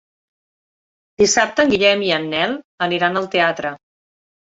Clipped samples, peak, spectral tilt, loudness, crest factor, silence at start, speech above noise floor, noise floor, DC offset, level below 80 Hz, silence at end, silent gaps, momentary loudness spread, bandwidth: under 0.1%; -2 dBFS; -3 dB/octave; -17 LUFS; 18 dB; 1.2 s; over 73 dB; under -90 dBFS; under 0.1%; -54 dBFS; 0.65 s; 2.64-2.78 s; 8 LU; 8 kHz